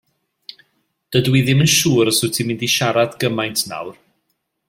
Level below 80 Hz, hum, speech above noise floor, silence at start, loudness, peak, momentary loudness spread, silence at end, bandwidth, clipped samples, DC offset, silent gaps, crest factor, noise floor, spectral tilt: -54 dBFS; none; 54 dB; 1.1 s; -16 LUFS; -2 dBFS; 9 LU; 0.75 s; 16.5 kHz; under 0.1%; under 0.1%; none; 16 dB; -71 dBFS; -4 dB/octave